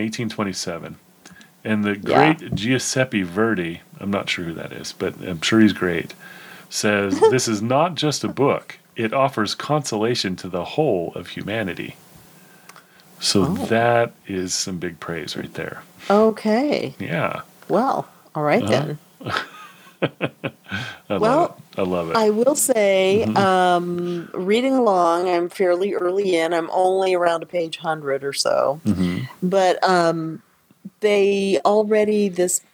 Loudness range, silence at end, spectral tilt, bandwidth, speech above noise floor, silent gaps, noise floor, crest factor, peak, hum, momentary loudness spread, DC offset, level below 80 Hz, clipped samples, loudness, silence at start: 5 LU; 0.15 s; -4.5 dB/octave; over 20 kHz; 28 dB; none; -48 dBFS; 20 dB; 0 dBFS; none; 13 LU; under 0.1%; -58 dBFS; under 0.1%; -20 LUFS; 0 s